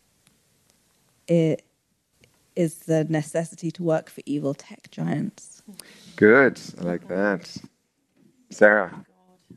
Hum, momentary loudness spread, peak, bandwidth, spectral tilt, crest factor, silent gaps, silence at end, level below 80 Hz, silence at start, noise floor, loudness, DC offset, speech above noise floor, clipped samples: none; 25 LU; 0 dBFS; 13 kHz; -6.5 dB/octave; 24 dB; none; 0.05 s; -70 dBFS; 1.3 s; -70 dBFS; -23 LUFS; under 0.1%; 47 dB; under 0.1%